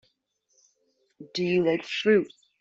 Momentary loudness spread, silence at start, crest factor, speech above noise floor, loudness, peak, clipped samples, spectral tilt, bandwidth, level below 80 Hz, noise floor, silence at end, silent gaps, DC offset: 12 LU; 1.2 s; 18 dB; 49 dB; -25 LUFS; -10 dBFS; under 0.1%; -6 dB/octave; 7.8 kHz; -70 dBFS; -73 dBFS; 0.35 s; none; under 0.1%